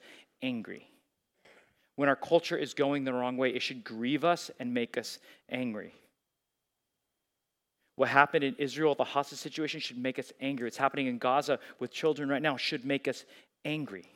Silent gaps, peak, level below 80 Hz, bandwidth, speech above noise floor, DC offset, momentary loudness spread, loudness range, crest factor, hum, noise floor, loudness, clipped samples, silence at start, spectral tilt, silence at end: none; -6 dBFS; -88 dBFS; 16 kHz; 53 dB; under 0.1%; 12 LU; 5 LU; 26 dB; none; -85 dBFS; -31 LUFS; under 0.1%; 0.05 s; -4.5 dB/octave; 0.15 s